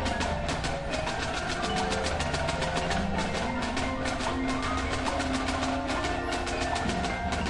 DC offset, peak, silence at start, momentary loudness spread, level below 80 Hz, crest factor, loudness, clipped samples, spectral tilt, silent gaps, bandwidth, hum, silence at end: under 0.1%; -12 dBFS; 0 s; 2 LU; -40 dBFS; 16 dB; -29 LUFS; under 0.1%; -4.5 dB/octave; none; 11.5 kHz; none; 0 s